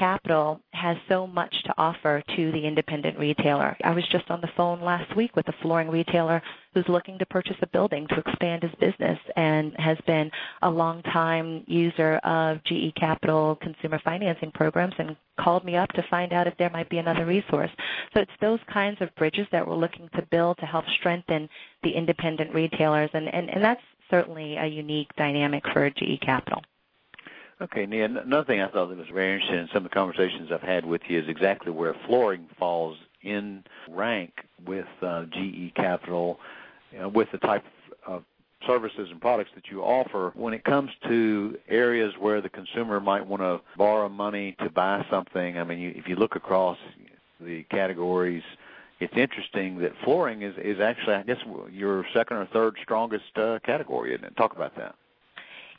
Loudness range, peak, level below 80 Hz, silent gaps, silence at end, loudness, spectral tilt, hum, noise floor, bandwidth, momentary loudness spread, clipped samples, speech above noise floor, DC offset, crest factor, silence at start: 4 LU; -4 dBFS; -64 dBFS; none; 0.05 s; -26 LUFS; -9 dB/octave; none; -54 dBFS; 5.2 kHz; 9 LU; under 0.1%; 28 dB; under 0.1%; 22 dB; 0 s